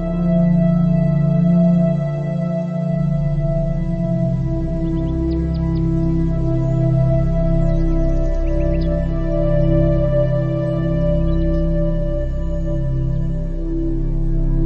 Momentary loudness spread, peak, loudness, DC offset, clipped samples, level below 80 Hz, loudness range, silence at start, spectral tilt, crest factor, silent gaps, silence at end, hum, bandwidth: 7 LU; -4 dBFS; -19 LUFS; under 0.1%; under 0.1%; -22 dBFS; 3 LU; 0 s; -10.5 dB/octave; 14 dB; none; 0 s; none; 5.2 kHz